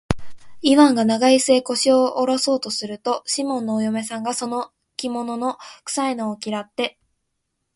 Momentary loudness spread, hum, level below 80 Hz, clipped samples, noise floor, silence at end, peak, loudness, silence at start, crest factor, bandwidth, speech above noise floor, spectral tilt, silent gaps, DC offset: 13 LU; none; -50 dBFS; under 0.1%; -75 dBFS; 0.85 s; 0 dBFS; -20 LUFS; 0.1 s; 20 dB; 11.5 kHz; 55 dB; -3.5 dB/octave; none; under 0.1%